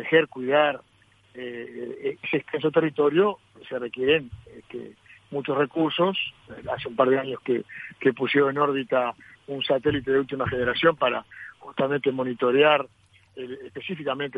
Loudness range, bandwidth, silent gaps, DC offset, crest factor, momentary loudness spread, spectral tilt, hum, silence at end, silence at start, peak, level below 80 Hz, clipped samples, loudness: 3 LU; 4.9 kHz; none; under 0.1%; 20 dB; 18 LU; -7.5 dB/octave; none; 0 s; 0 s; -6 dBFS; -60 dBFS; under 0.1%; -24 LUFS